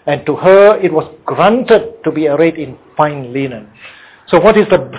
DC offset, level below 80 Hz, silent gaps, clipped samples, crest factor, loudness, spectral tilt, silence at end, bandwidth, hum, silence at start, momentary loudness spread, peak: under 0.1%; -46 dBFS; none; 0.1%; 12 dB; -11 LUFS; -10.5 dB/octave; 0 s; 4 kHz; none; 0.05 s; 14 LU; 0 dBFS